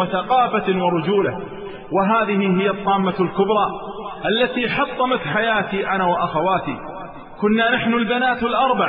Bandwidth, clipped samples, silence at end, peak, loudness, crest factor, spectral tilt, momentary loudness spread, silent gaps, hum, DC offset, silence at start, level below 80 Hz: 5.2 kHz; under 0.1%; 0 s; -6 dBFS; -19 LUFS; 14 dB; -10 dB/octave; 12 LU; none; none; under 0.1%; 0 s; -48 dBFS